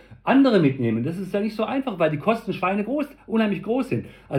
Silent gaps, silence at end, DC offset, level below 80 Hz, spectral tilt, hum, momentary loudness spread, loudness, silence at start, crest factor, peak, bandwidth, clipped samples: none; 0 s; under 0.1%; -58 dBFS; -8 dB/octave; none; 8 LU; -23 LUFS; 0.1 s; 16 dB; -6 dBFS; 13.5 kHz; under 0.1%